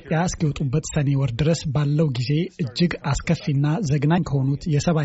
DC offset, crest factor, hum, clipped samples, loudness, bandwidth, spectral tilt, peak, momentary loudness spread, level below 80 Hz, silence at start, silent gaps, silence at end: under 0.1%; 14 dB; none; under 0.1%; -22 LUFS; 8 kHz; -7 dB/octave; -8 dBFS; 3 LU; -40 dBFS; 0.05 s; none; 0 s